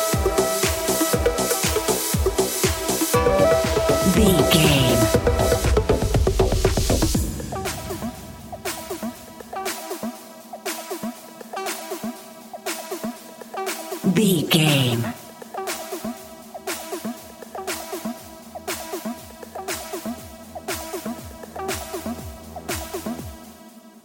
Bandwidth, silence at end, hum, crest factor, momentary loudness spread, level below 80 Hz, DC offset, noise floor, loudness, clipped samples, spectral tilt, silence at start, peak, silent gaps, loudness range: 17 kHz; 0.05 s; none; 22 dB; 19 LU; -32 dBFS; under 0.1%; -45 dBFS; -22 LUFS; under 0.1%; -4.5 dB/octave; 0 s; -2 dBFS; none; 13 LU